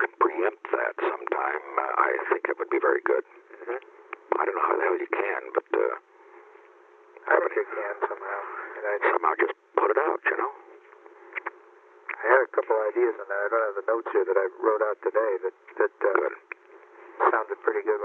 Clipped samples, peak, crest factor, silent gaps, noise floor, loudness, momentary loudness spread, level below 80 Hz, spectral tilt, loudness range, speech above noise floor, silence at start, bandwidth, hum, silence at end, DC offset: under 0.1%; -6 dBFS; 22 dB; none; -54 dBFS; -26 LUFS; 12 LU; under -90 dBFS; -4.5 dB/octave; 3 LU; 28 dB; 0 s; 4 kHz; none; 0 s; under 0.1%